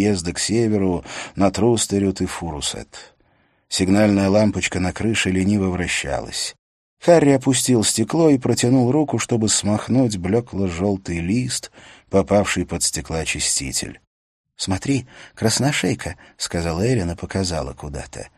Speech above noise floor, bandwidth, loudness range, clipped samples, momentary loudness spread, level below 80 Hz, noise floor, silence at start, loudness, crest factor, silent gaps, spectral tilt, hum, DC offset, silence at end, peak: 41 dB; 13.5 kHz; 5 LU; under 0.1%; 10 LU; -42 dBFS; -61 dBFS; 0 s; -20 LUFS; 20 dB; 6.59-6.97 s, 14.07-14.44 s; -4.5 dB/octave; none; under 0.1%; 0.1 s; 0 dBFS